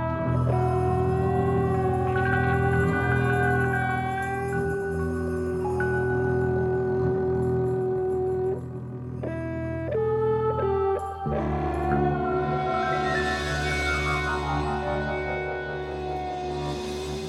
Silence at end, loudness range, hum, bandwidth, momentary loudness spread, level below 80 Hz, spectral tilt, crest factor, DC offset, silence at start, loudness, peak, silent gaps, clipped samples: 0 s; 4 LU; none; 12.5 kHz; 8 LU; -40 dBFS; -7 dB/octave; 14 dB; under 0.1%; 0 s; -26 LUFS; -10 dBFS; none; under 0.1%